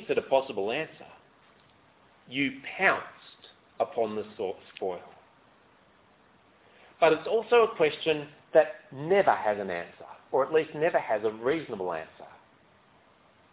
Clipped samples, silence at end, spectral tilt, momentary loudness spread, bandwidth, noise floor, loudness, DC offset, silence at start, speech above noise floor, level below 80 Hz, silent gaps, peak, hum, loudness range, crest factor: under 0.1%; 1.25 s; -8.5 dB/octave; 13 LU; 4 kHz; -61 dBFS; -28 LUFS; under 0.1%; 0 s; 33 dB; -70 dBFS; none; -8 dBFS; none; 10 LU; 22 dB